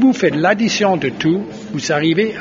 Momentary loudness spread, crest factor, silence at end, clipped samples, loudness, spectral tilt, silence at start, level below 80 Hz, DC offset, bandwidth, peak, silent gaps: 7 LU; 14 dB; 0 s; under 0.1%; -16 LUFS; -4 dB/octave; 0 s; -54 dBFS; under 0.1%; 7.6 kHz; 0 dBFS; none